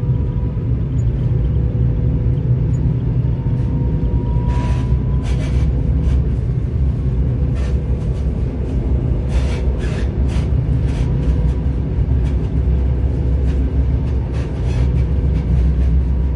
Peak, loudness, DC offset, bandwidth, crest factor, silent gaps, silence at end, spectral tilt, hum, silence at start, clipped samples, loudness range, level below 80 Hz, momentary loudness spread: -4 dBFS; -18 LUFS; under 0.1%; 6.8 kHz; 12 dB; none; 0 s; -9 dB/octave; none; 0 s; under 0.1%; 1 LU; -18 dBFS; 3 LU